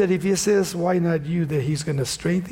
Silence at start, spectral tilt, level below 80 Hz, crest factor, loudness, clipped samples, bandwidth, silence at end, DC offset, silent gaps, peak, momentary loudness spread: 0 s; -5.5 dB/octave; -50 dBFS; 12 dB; -22 LUFS; under 0.1%; 16.5 kHz; 0 s; under 0.1%; none; -10 dBFS; 5 LU